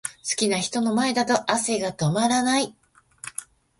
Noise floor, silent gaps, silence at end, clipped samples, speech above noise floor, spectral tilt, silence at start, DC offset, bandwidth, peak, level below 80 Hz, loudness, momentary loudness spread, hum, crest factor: -43 dBFS; none; 0.35 s; under 0.1%; 21 dB; -3.5 dB/octave; 0.05 s; under 0.1%; 12 kHz; -6 dBFS; -62 dBFS; -23 LUFS; 14 LU; none; 20 dB